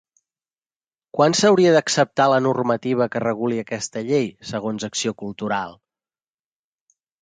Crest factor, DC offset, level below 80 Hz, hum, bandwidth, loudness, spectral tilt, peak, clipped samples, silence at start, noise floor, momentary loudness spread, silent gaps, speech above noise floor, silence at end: 18 dB; under 0.1%; -64 dBFS; none; 9.6 kHz; -20 LUFS; -4.5 dB/octave; -4 dBFS; under 0.1%; 1.15 s; under -90 dBFS; 12 LU; none; over 70 dB; 1.45 s